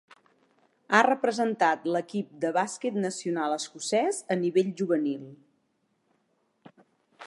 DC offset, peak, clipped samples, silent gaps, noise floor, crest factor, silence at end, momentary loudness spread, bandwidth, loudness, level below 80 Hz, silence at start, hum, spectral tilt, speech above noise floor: under 0.1%; -4 dBFS; under 0.1%; none; -73 dBFS; 24 dB; 0 s; 8 LU; 11.5 kHz; -27 LUFS; -84 dBFS; 0.9 s; none; -4.5 dB/octave; 46 dB